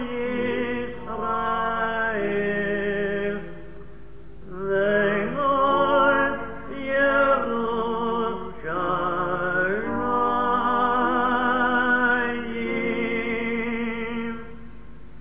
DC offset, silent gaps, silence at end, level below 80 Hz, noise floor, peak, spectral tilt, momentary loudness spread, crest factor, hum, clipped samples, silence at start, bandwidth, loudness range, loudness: 1%; none; 0 s; -48 dBFS; -44 dBFS; -8 dBFS; -9 dB/octave; 11 LU; 16 dB; none; under 0.1%; 0 s; 3.9 kHz; 4 LU; -24 LUFS